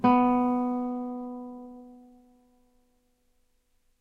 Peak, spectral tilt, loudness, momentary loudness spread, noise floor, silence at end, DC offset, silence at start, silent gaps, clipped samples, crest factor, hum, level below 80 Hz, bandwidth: -10 dBFS; -8.5 dB/octave; -27 LUFS; 23 LU; -69 dBFS; 2.05 s; under 0.1%; 0 s; none; under 0.1%; 18 dB; none; -64 dBFS; 5 kHz